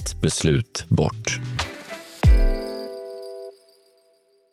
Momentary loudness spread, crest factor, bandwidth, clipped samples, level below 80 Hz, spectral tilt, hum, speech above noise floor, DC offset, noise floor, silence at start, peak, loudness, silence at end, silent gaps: 17 LU; 16 dB; 14 kHz; under 0.1%; -26 dBFS; -5 dB/octave; none; 39 dB; under 0.1%; -61 dBFS; 0 s; -6 dBFS; -23 LUFS; 1 s; none